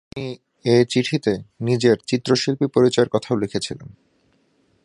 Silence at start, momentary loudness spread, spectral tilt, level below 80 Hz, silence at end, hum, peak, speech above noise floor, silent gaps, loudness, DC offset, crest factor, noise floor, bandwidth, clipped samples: 0.15 s; 14 LU; -5.5 dB/octave; -56 dBFS; 0.95 s; none; -2 dBFS; 43 dB; none; -20 LUFS; under 0.1%; 18 dB; -63 dBFS; 11.5 kHz; under 0.1%